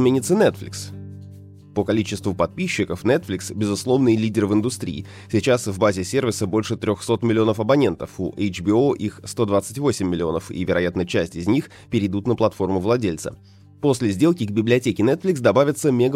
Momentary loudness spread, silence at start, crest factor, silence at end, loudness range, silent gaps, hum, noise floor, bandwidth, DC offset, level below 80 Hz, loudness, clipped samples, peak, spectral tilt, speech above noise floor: 10 LU; 0 s; 18 dB; 0 s; 2 LU; none; none; -42 dBFS; 16 kHz; under 0.1%; -52 dBFS; -21 LUFS; under 0.1%; -4 dBFS; -6 dB/octave; 21 dB